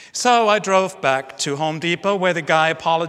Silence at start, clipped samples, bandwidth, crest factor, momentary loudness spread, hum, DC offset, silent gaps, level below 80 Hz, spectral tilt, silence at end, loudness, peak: 0 s; under 0.1%; 15 kHz; 18 dB; 6 LU; none; under 0.1%; none; -68 dBFS; -3.5 dB/octave; 0 s; -18 LUFS; 0 dBFS